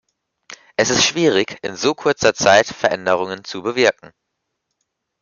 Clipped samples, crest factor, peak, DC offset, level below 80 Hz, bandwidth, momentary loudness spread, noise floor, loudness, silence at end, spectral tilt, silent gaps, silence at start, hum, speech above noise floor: under 0.1%; 18 dB; -2 dBFS; under 0.1%; -56 dBFS; 10 kHz; 12 LU; -76 dBFS; -17 LUFS; 1.3 s; -2.5 dB/octave; none; 0.5 s; none; 59 dB